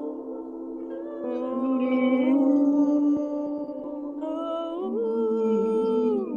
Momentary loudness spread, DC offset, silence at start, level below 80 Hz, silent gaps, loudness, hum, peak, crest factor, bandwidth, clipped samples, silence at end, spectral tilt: 14 LU; under 0.1%; 0 s; -68 dBFS; none; -25 LUFS; none; -12 dBFS; 14 dB; 6.8 kHz; under 0.1%; 0 s; -8 dB/octave